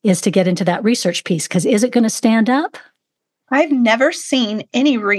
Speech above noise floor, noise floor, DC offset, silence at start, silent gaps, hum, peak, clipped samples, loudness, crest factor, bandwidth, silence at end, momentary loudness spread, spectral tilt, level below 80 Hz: 63 dB; -78 dBFS; under 0.1%; 0.05 s; none; none; 0 dBFS; under 0.1%; -16 LUFS; 16 dB; 12.5 kHz; 0 s; 5 LU; -4.5 dB/octave; -72 dBFS